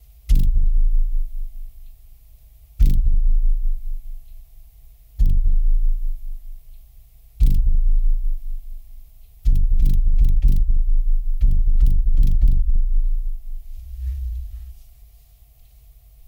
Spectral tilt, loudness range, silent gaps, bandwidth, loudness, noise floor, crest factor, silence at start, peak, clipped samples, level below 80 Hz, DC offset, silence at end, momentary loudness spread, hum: -8 dB/octave; 6 LU; none; 0.5 kHz; -24 LUFS; -49 dBFS; 12 dB; 0.3 s; -4 dBFS; under 0.1%; -18 dBFS; under 0.1%; 1.55 s; 18 LU; none